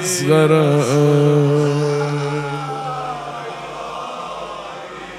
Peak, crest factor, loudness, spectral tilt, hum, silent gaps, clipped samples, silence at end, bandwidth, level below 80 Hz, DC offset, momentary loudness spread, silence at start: -2 dBFS; 16 dB; -17 LUFS; -6 dB/octave; none; none; under 0.1%; 0 s; 14 kHz; -54 dBFS; under 0.1%; 15 LU; 0 s